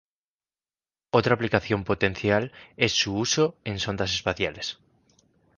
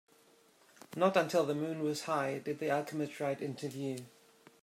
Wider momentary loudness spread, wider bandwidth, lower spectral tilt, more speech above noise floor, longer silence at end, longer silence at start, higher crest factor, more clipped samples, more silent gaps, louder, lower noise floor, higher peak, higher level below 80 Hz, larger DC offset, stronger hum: about the same, 8 LU vs 10 LU; second, 10.5 kHz vs 16 kHz; second, -4 dB/octave vs -5.5 dB/octave; first, over 65 dB vs 31 dB; first, 0.85 s vs 0.55 s; first, 1.15 s vs 0.9 s; about the same, 24 dB vs 20 dB; neither; neither; first, -25 LUFS vs -35 LUFS; first, under -90 dBFS vs -65 dBFS; first, -2 dBFS vs -16 dBFS; first, -50 dBFS vs -84 dBFS; neither; neither